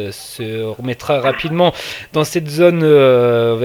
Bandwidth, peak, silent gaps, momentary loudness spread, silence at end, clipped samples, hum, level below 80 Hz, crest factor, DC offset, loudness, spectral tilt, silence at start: 19 kHz; 0 dBFS; none; 15 LU; 0 s; under 0.1%; none; -50 dBFS; 14 dB; under 0.1%; -14 LUFS; -6 dB/octave; 0 s